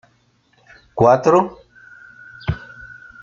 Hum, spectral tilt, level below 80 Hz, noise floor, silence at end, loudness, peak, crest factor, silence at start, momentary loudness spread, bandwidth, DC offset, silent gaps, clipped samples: none; -7.5 dB/octave; -44 dBFS; -59 dBFS; 0.3 s; -17 LUFS; -2 dBFS; 20 dB; 0.95 s; 25 LU; 7.4 kHz; under 0.1%; none; under 0.1%